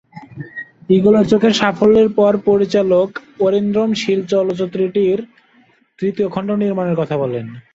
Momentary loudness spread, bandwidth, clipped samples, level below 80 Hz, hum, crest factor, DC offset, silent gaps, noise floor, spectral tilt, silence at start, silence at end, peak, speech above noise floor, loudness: 11 LU; 7.8 kHz; under 0.1%; -52 dBFS; none; 14 dB; under 0.1%; none; -54 dBFS; -6.5 dB/octave; 0.15 s; 0.15 s; -2 dBFS; 39 dB; -15 LUFS